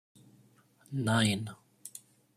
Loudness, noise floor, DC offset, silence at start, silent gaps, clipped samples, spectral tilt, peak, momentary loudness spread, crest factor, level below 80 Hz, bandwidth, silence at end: -31 LUFS; -64 dBFS; under 0.1%; 0.9 s; none; under 0.1%; -4.5 dB/octave; -16 dBFS; 21 LU; 20 dB; -70 dBFS; 15 kHz; 0.4 s